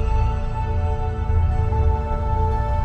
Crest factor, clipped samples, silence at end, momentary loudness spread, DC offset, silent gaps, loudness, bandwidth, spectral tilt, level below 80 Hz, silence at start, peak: 12 dB; under 0.1%; 0 s; 4 LU; under 0.1%; none; -23 LUFS; 6.2 kHz; -9 dB/octave; -22 dBFS; 0 s; -8 dBFS